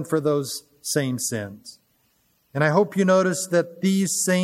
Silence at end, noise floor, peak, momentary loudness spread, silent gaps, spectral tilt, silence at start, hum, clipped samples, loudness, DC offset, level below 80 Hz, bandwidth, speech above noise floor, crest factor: 0 s; -66 dBFS; -4 dBFS; 12 LU; none; -4.5 dB/octave; 0 s; none; under 0.1%; -22 LUFS; under 0.1%; -70 dBFS; 16 kHz; 44 dB; 18 dB